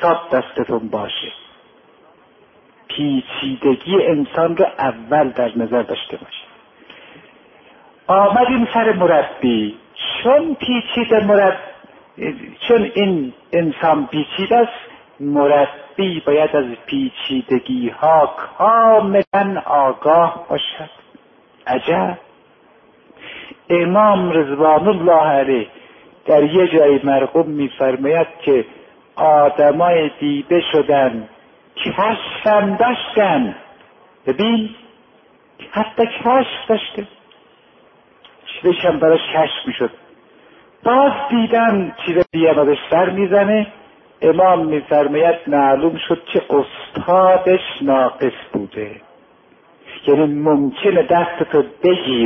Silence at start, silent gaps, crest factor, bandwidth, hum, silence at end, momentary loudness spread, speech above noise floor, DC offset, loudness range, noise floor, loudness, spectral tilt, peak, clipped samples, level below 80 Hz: 0 s; 19.27-19.31 s; 14 dB; 5.8 kHz; none; 0 s; 13 LU; 36 dB; under 0.1%; 6 LU; -51 dBFS; -16 LUFS; -9 dB/octave; -2 dBFS; under 0.1%; -56 dBFS